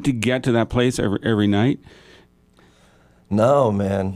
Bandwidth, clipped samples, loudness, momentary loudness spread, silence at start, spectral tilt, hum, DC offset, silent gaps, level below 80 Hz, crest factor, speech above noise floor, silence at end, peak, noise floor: 14.5 kHz; under 0.1%; -19 LUFS; 6 LU; 0 s; -6.5 dB/octave; none; under 0.1%; none; -46 dBFS; 16 dB; 36 dB; 0 s; -4 dBFS; -54 dBFS